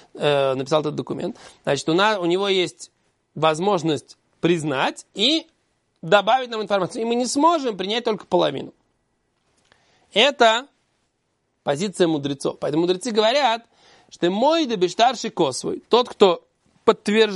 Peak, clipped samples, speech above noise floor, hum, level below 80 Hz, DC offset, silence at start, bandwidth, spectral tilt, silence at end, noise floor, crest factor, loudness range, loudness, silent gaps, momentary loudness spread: 0 dBFS; under 0.1%; 51 dB; none; -66 dBFS; under 0.1%; 0.15 s; 11.5 kHz; -4 dB/octave; 0 s; -71 dBFS; 20 dB; 2 LU; -21 LUFS; none; 10 LU